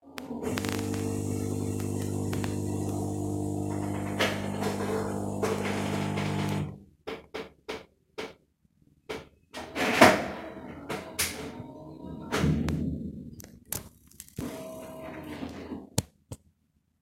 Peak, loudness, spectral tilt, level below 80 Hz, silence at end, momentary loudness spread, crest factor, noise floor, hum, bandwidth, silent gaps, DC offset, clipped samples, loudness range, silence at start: -2 dBFS; -31 LUFS; -5 dB/octave; -52 dBFS; 0.65 s; 15 LU; 30 dB; -72 dBFS; none; 16.5 kHz; none; under 0.1%; under 0.1%; 11 LU; 0.05 s